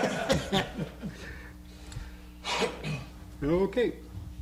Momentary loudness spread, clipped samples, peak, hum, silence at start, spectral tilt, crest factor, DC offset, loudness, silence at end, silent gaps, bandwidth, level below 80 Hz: 18 LU; under 0.1%; -16 dBFS; none; 0 s; -5 dB/octave; 16 dB; under 0.1%; -31 LUFS; 0 s; none; 16 kHz; -46 dBFS